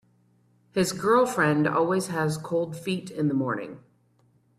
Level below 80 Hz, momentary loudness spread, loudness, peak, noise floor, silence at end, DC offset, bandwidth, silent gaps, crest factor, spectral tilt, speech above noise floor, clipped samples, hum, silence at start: -64 dBFS; 9 LU; -25 LUFS; -10 dBFS; -64 dBFS; 0.8 s; under 0.1%; 14 kHz; none; 18 dB; -5.5 dB/octave; 39 dB; under 0.1%; 60 Hz at -50 dBFS; 0.75 s